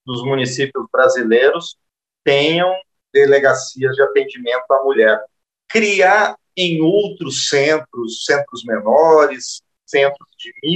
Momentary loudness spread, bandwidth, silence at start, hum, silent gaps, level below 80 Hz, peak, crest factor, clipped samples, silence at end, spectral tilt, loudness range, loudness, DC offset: 12 LU; 8.8 kHz; 0.05 s; none; none; -68 dBFS; -2 dBFS; 14 dB; under 0.1%; 0 s; -4 dB/octave; 1 LU; -15 LUFS; under 0.1%